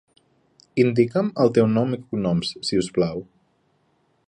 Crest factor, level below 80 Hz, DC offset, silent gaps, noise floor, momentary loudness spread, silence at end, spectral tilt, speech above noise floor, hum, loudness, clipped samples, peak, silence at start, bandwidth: 18 dB; -56 dBFS; under 0.1%; none; -66 dBFS; 7 LU; 1.05 s; -6.5 dB/octave; 45 dB; none; -22 LUFS; under 0.1%; -4 dBFS; 0.75 s; 10.5 kHz